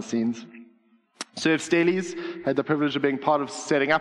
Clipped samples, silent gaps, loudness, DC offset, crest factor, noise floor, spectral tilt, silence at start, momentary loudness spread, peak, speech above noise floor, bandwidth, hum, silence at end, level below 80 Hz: under 0.1%; none; -25 LUFS; under 0.1%; 20 dB; -62 dBFS; -5 dB/octave; 0 s; 11 LU; -6 dBFS; 37 dB; 11.5 kHz; none; 0 s; -70 dBFS